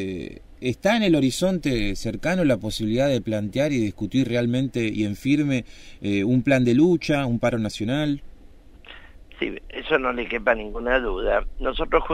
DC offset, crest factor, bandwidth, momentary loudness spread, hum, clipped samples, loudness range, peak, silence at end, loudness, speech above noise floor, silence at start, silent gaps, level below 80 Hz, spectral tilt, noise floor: under 0.1%; 18 dB; 15.5 kHz; 11 LU; none; under 0.1%; 4 LU; -6 dBFS; 0 s; -23 LUFS; 23 dB; 0 s; none; -38 dBFS; -6 dB/octave; -46 dBFS